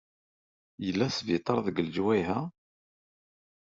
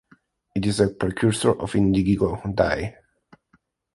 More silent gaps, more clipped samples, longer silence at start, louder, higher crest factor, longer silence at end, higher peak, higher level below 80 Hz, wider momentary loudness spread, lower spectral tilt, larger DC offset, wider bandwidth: neither; neither; first, 0.8 s vs 0.55 s; second, -30 LUFS vs -22 LUFS; about the same, 20 dB vs 18 dB; first, 1.25 s vs 1.05 s; second, -12 dBFS vs -4 dBFS; second, -68 dBFS vs -42 dBFS; about the same, 7 LU vs 7 LU; about the same, -5 dB/octave vs -6 dB/octave; neither; second, 7.6 kHz vs 11.5 kHz